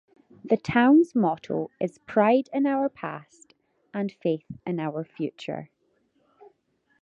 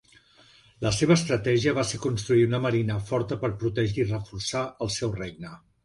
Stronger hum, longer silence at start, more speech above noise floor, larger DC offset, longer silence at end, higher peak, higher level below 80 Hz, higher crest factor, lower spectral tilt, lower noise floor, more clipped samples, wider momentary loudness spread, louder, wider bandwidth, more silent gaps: neither; second, 0.45 s vs 0.8 s; first, 45 dB vs 31 dB; neither; first, 1.35 s vs 0.3 s; about the same, -6 dBFS vs -8 dBFS; second, -64 dBFS vs -50 dBFS; about the same, 20 dB vs 18 dB; first, -7.5 dB/octave vs -5.5 dB/octave; first, -70 dBFS vs -57 dBFS; neither; first, 17 LU vs 9 LU; about the same, -25 LUFS vs -26 LUFS; second, 7.8 kHz vs 11.5 kHz; neither